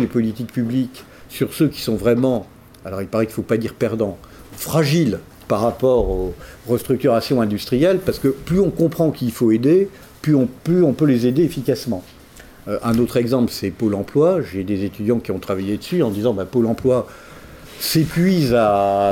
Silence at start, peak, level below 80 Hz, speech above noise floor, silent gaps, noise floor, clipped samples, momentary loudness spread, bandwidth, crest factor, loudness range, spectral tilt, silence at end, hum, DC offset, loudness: 0 s; -4 dBFS; -42 dBFS; 24 dB; none; -43 dBFS; under 0.1%; 10 LU; 17 kHz; 14 dB; 4 LU; -6.5 dB/octave; 0 s; none; under 0.1%; -19 LUFS